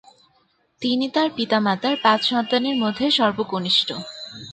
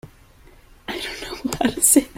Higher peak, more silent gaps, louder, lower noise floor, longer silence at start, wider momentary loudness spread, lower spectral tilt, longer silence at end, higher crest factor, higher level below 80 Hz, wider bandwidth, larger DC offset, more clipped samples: about the same, -4 dBFS vs -2 dBFS; neither; about the same, -20 LUFS vs -20 LUFS; first, -63 dBFS vs -49 dBFS; first, 0.8 s vs 0.05 s; second, 9 LU vs 17 LU; first, -4.5 dB/octave vs -2 dB/octave; about the same, 0 s vs 0.1 s; about the same, 18 dB vs 20 dB; second, -64 dBFS vs -46 dBFS; second, 9.2 kHz vs 16.5 kHz; neither; neither